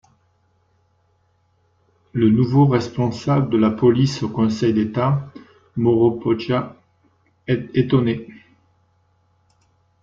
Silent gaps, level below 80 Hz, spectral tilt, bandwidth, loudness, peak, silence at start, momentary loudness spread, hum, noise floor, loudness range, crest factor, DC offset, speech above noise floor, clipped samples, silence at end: none; -54 dBFS; -8 dB/octave; 7.6 kHz; -19 LUFS; -4 dBFS; 2.15 s; 10 LU; none; -63 dBFS; 6 LU; 16 dB; under 0.1%; 45 dB; under 0.1%; 1.7 s